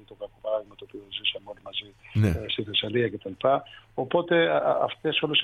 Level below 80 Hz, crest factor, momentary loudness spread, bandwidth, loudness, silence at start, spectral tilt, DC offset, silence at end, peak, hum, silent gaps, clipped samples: -50 dBFS; 18 dB; 14 LU; 13 kHz; -27 LUFS; 0.1 s; -6.5 dB/octave; under 0.1%; 0 s; -10 dBFS; none; none; under 0.1%